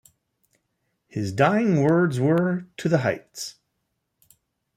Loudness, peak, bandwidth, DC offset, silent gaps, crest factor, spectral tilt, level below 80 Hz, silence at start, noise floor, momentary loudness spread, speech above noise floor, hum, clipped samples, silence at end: -22 LUFS; -6 dBFS; 14.5 kHz; under 0.1%; none; 18 dB; -7 dB/octave; -64 dBFS; 1.15 s; -77 dBFS; 16 LU; 55 dB; none; under 0.1%; 1.25 s